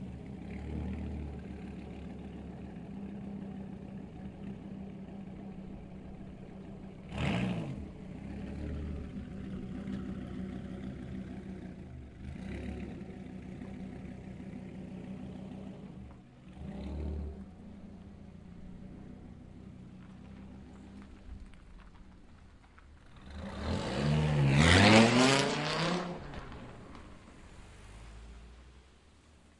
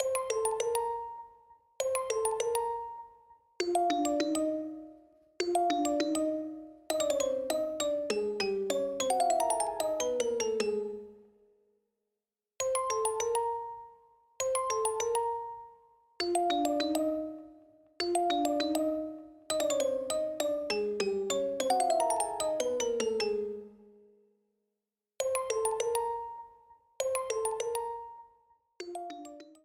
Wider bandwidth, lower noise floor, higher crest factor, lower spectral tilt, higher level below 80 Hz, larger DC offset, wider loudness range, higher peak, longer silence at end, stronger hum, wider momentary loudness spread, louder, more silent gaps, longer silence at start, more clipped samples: second, 11.5 kHz vs 19.5 kHz; second, -60 dBFS vs -90 dBFS; first, 30 dB vs 18 dB; first, -5 dB/octave vs -2.5 dB/octave; first, -50 dBFS vs -68 dBFS; neither; first, 24 LU vs 4 LU; first, -6 dBFS vs -14 dBFS; about the same, 0.2 s vs 0.1 s; neither; first, 21 LU vs 14 LU; about the same, -34 LUFS vs -32 LUFS; neither; about the same, 0 s vs 0 s; neither